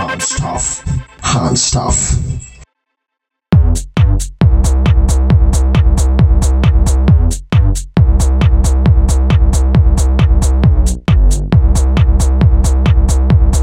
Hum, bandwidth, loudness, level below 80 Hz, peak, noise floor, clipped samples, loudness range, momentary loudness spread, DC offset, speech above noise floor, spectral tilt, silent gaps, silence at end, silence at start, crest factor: none; 13 kHz; -12 LUFS; -12 dBFS; 0 dBFS; -77 dBFS; under 0.1%; 4 LU; 5 LU; under 0.1%; 63 dB; -5.5 dB/octave; none; 0 s; 0 s; 10 dB